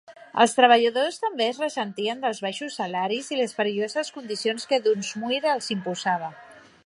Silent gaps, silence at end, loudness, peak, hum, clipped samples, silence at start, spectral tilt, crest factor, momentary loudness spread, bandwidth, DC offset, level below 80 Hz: none; 0.25 s; -24 LUFS; -4 dBFS; none; under 0.1%; 0.1 s; -3.5 dB/octave; 22 dB; 12 LU; 11.5 kHz; under 0.1%; -78 dBFS